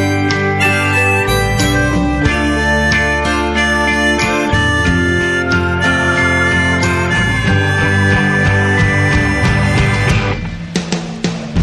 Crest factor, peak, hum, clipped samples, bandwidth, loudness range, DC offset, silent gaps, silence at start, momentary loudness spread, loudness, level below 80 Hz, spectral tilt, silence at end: 12 dB; 0 dBFS; none; under 0.1%; 12.5 kHz; 1 LU; under 0.1%; none; 0 s; 4 LU; -13 LUFS; -26 dBFS; -5 dB/octave; 0 s